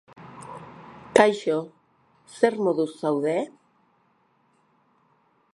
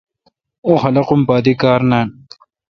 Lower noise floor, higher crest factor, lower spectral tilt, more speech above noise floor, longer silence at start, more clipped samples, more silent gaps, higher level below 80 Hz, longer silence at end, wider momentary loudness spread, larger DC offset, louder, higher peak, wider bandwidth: first, -65 dBFS vs -61 dBFS; first, 26 dB vs 16 dB; second, -5 dB/octave vs -8.5 dB/octave; second, 42 dB vs 49 dB; second, 0.2 s vs 0.65 s; neither; neither; second, -68 dBFS vs -50 dBFS; first, 2.05 s vs 0.6 s; first, 25 LU vs 6 LU; neither; second, -23 LUFS vs -14 LUFS; about the same, 0 dBFS vs 0 dBFS; first, 11.5 kHz vs 6.6 kHz